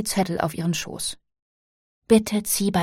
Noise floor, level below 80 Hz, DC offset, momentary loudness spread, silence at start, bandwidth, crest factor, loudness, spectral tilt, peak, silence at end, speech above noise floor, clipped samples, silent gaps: under -90 dBFS; -52 dBFS; under 0.1%; 10 LU; 0 s; 16.5 kHz; 20 dB; -23 LUFS; -4.5 dB/octave; -4 dBFS; 0 s; over 67 dB; under 0.1%; 1.42-2.02 s